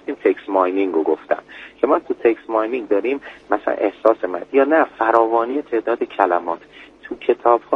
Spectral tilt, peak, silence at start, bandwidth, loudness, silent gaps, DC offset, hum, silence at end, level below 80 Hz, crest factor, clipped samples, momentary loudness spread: -6.5 dB/octave; 0 dBFS; 0.05 s; 6.2 kHz; -19 LUFS; none; under 0.1%; none; 0 s; -62 dBFS; 18 dB; under 0.1%; 9 LU